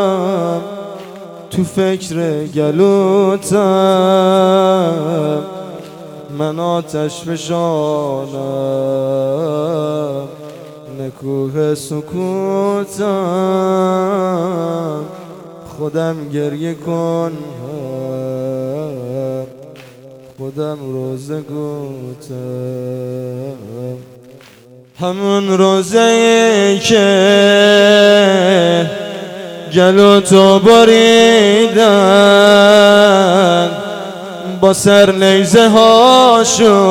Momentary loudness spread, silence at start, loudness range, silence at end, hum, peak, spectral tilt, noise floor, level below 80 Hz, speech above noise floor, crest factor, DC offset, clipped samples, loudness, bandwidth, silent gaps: 20 LU; 0 s; 16 LU; 0 s; none; 0 dBFS; -4.5 dB/octave; -41 dBFS; -52 dBFS; 30 dB; 12 dB; under 0.1%; 0.4%; -11 LUFS; 16.5 kHz; none